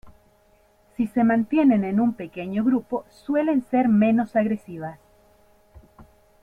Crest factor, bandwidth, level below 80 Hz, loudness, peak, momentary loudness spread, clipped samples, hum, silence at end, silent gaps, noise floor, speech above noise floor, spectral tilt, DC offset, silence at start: 14 dB; 4.5 kHz; -58 dBFS; -22 LUFS; -10 dBFS; 14 LU; under 0.1%; none; 0.4 s; none; -59 dBFS; 38 dB; -9 dB/octave; under 0.1%; 0.05 s